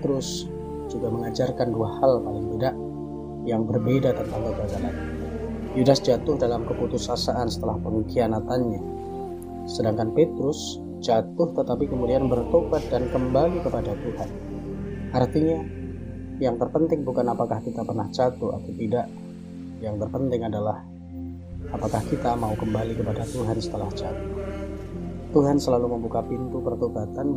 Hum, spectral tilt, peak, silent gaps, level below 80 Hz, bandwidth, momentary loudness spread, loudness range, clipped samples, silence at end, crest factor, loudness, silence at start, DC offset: none; -7 dB/octave; -4 dBFS; none; -42 dBFS; 15.5 kHz; 12 LU; 4 LU; under 0.1%; 0 s; 20 dB; -26 LUFS; 0 s; 0.1%